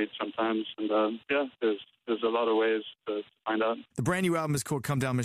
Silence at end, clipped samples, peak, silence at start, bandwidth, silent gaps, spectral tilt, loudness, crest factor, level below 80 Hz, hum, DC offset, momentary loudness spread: 0 s; under 0.1%; -16 dBFS; 0 s; 15.5 kHz; none; -5.5 dB/octave; -30 LUFS; 12 dB; -66 dBFS; none; under 0.1%; 8 LU